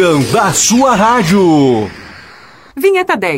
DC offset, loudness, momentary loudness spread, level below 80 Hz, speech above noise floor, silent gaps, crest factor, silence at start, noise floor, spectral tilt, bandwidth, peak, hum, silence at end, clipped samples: under 0.1%; -10 LUFS; 11 LU; -42 dBFS; 28 dB; none; 10 dB; 0 s; -38 dBFS; -4 dB/octave; 16.5 kHz; 0 dBFS; none; 0 s; under 0.1%